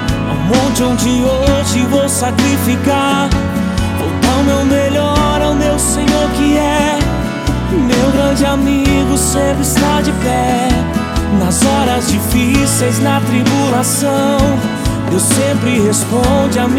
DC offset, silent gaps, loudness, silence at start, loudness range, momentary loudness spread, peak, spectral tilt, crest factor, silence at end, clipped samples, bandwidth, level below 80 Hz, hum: under 0.1%; none; -13 LUFS; 0 s; 1 LU; 4 LU; 0 dBFS; -5 dB/octave; 12 dB; 0 s; under 0.1%; 17 kHz; -24 dBFS; none